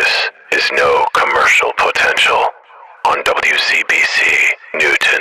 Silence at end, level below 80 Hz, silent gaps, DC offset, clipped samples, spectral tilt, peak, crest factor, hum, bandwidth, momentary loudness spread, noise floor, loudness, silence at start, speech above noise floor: 0 s; -50 dBFS; none; under 0.1%; under 0.1%; -0.5 dB/octave; -4 dBFS; 8 dB; none; 14 kHz; 6 LU; -39 dBFS; -12 LUFS; 0 s; 26 dB